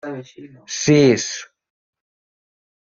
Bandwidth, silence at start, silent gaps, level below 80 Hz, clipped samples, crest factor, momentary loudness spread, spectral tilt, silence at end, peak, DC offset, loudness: 7.6 kHz; 0.05 s; none; -58 dBFS; under 0.1%; 20 dB; 18 LU; -5 dB/octave; 1.5 s; -2 dBFS; under 0.1%; -16 LUFS